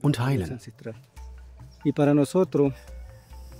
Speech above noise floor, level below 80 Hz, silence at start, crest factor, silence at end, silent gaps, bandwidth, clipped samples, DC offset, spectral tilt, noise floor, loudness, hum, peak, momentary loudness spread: 22 dB; -46 dBFS; 0.05 s; 18 dB; 0 s; none; 15.5 kHz; under 0.1%; under 0.1%; -7.5 dB/octave; -46 dBFS; -24 LUFS; none; -8 dBFS; 24 LU